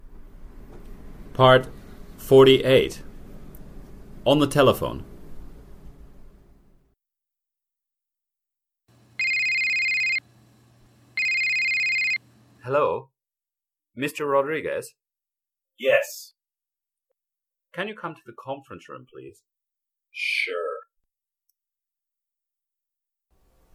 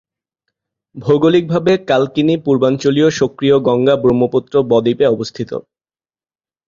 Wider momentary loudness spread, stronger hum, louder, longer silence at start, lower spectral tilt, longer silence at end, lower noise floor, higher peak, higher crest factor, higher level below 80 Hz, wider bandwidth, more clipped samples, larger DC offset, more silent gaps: first, 23 LU vs 8 LU; neither; second, -21 LUFS vs -14 LUFS; second, 0.05 s vs 0.95 s; second, -5 dB/octave vs -6.5 dB/octave; first, 2.95 s vs 1.05 s; about the same, under -90 dBFS vs under -90 dBFS; about the same, -2 dBFS vs 0 dBFS; first, 24 dB vs 14 dB; about the same, -48 dBFS vs -50 dBFS; first, 16 kHz vs 7.4 kHz; neither; neither; neither